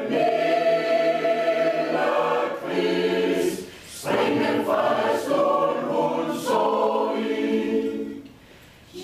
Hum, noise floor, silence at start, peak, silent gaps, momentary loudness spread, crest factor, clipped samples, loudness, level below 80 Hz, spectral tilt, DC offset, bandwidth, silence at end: none; -49 dBFS; 0 s; -10 dBFS; none; 6 LU; 14 dB; under 0.1%; -23 LUFS; -64 dBFS; -5 dB/octave; under 0.1%; 15.5 kHz; 0 s